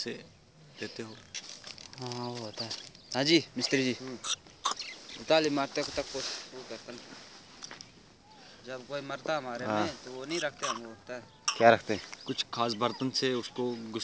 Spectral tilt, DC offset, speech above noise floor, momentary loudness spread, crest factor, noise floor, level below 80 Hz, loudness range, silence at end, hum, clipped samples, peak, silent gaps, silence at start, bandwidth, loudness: -3.5 dB/octave; under 0.1%; 24 dB; 19 LU; 28 dB; -57 dBFS; -68 dBFS; 10 LU; 0 s; none; under 0.1%; -6 dBFS; none; 0 s; 8 kHz; -32 LUFS